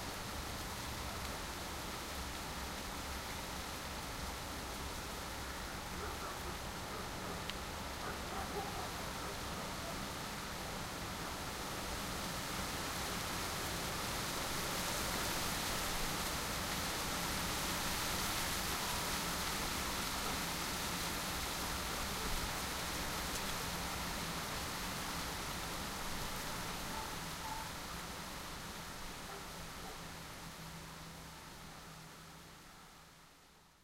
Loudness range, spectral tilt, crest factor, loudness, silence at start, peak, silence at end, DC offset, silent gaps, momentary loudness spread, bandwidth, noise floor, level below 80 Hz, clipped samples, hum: 9 LU; -2.5 dB/octave; 22 dB; -40 LUFS; 0 s; -20 dBFS; 0.15 s; under 0.1%; none; 10 LU; 16 kHz; -64 dBFS; -52 dBFS; under 0.1%; none